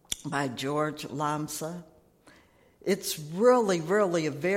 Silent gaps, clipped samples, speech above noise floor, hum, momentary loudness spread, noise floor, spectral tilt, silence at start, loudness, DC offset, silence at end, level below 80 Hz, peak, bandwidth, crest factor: none; under 0.1%; 32 dB; none; 13 LU; -60 dBFS; -4.5 dB/octave; 0.1 s; -28 LUFS; under 0.1%; 0 s; -66 dBFS; -10 dBFS; 16.5 kHz; 18 dB